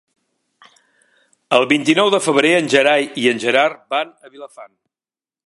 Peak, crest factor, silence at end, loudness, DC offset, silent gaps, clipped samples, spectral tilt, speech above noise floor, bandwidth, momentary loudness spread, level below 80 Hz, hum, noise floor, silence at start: 0 dBFS; 18 dB; 0.8 s; -15 LUFS; under 0.1%; none; under 0.1%; -3.5 dB/octave; over 74 dB; 11.5 kHz; 9 LU; -70 dBFS; none; under -90 dBFS; 1.5 s